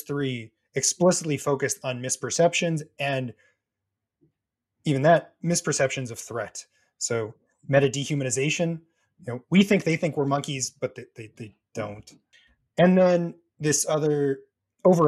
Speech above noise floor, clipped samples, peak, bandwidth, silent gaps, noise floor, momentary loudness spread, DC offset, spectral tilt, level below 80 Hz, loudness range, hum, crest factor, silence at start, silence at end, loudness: 60 dB; under 0.1%; -6 dBFS; 14 kHz; none; -84 dBFS; 17 LU; under 0.1%; -4.5 dB/octave; -64 dBFS; 3 LU; none; 18 dB; 0.1 s; 0 s; -25 LUFS